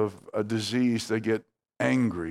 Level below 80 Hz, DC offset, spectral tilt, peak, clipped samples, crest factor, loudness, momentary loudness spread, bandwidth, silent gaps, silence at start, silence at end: -62 dBFS; under 0.1%; -5.5 dB/octave; -8 dBFS; under 0.1%; 18 dB; -28 LUFS; 5 LU; 13 kHz; none; 0 s; 0 s